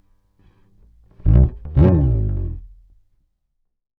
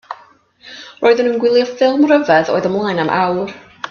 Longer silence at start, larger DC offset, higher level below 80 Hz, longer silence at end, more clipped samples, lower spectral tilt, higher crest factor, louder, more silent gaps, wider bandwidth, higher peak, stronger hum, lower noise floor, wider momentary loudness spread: first, 1.25 s vs 0.1 s; neither; first, -24 dBFS vs -60 dBFS; first, 1.3 s vs 0 s; neither; first, -12.5 dB/octave vs -6 dB/octave; about the same, 18 dB vs 16 dB; second, -18 LUFS vs -14 LUFS; neither; second, 3.2 kHz vs 7 kHz; about the same, 0 dBFS vs 0 dBFS; neither; first, -71 dBFS vs -47 dBFS; second, 14 LU vs 21 LU